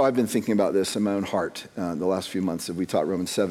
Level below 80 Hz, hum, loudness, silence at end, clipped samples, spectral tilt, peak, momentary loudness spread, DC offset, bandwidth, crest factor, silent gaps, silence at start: -66 dBFS; none; -26 LUFS; 0 s; under 0.1%; -5 dB/octave; -10 dBFS; 7 LU; under 0.1%; 16.5 kHz; 16 dB; none; 0 s